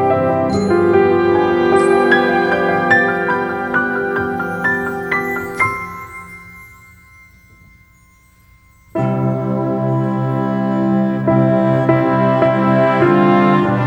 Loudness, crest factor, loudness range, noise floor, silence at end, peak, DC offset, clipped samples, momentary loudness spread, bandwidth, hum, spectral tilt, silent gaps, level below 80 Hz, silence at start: -15 LUFS; 14 dB; 12 LU; -49 dBFS; 0 s; 0 dBFS; under 0.1%; under 0.1%; 7 LU; 14 kHz; none; -7.5 dB/octave; none; -48 dBFS; 0 s